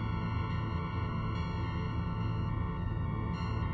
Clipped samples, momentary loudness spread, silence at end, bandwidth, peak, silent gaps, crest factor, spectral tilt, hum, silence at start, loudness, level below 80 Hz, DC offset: under 0.1%; 1 LU; 0 s; 6 kHz; -22 dBFS; none; 12 dB; -8.5 dB/octave; none; 0 s; -35 LUFS; -42 dBFS; under 0.1%